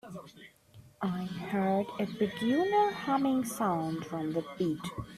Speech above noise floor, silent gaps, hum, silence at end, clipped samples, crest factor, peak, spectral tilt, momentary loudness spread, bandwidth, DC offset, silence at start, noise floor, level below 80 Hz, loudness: 26 dB; none; none; 0 s; under 0.1%; 16 dB; -16 dBFS; -6 dB/octave; 10 LU; 14.5 kHz; under 0.1%; 0.05 s; -57 dBFS; -64 dBFS; -32 LUFS